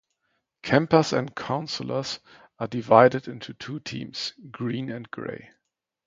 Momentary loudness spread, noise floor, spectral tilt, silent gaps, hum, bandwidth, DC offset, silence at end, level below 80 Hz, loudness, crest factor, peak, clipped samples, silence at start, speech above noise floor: 18 LU; -76 dBFS; -5.5 dB/octave; none; none; 7.8 kHz; under 0.1%; 0.6 s; -64 dBFS; -25 LUFS; 26 dB; 0 dBFS; under 0.1%; 0.65 s; 51 dB